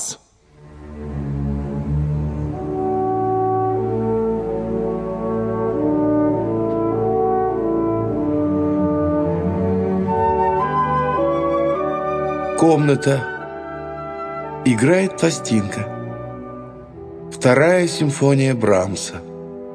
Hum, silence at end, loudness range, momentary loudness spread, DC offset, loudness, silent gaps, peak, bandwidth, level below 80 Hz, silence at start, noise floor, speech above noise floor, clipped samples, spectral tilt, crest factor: none; 0 s; 3 LU; 14 LU; under 0.1%; -19 LUFS; none; 0 dBFS; 11 kHz; -38 dBFS; 0 s; -48 dBFS; 32 dB; under 0.1%; -6.5 dB/octave; 18 dB